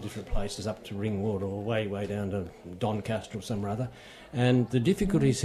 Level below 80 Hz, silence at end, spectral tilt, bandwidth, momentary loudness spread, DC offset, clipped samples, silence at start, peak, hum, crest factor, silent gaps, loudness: -44 dBFS; 0 s; -6.5 dB/octave; 14 kHz; 11 LU; under 0.1%; under 0.1%; 0 s; -12 dBFS; none; 18 dB; none; -30 LUFS